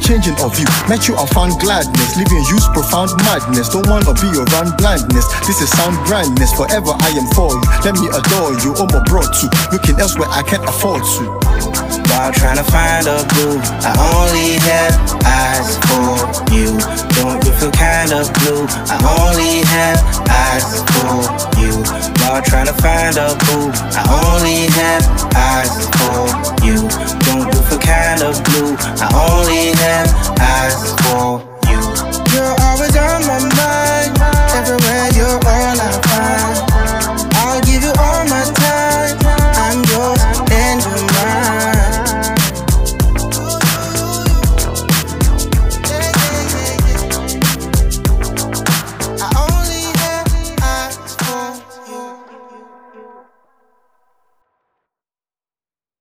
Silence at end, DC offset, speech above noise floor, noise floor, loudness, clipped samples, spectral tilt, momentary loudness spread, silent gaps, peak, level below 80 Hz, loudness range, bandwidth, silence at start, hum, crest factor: 2.95 s; under 0.1%; over 78 dB; under -90 dBFS; -13 LUFS; under 0.1%; -4 dB/octave; 5 LU; none; 0 dBFS; -18 dBFS; 3 LU; 16.5 kHz; 0 s; none; 12 dB